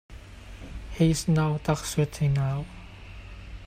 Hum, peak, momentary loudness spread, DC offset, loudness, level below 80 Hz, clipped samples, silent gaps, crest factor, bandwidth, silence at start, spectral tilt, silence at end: none; -10 dBFS; 21 LU; under 0.1%; -26 LUFS; -42 dBFS; under 0.1%; none; 18 dB; 15.5 kHz; 0.1 s; -6 dB/octave; 0 s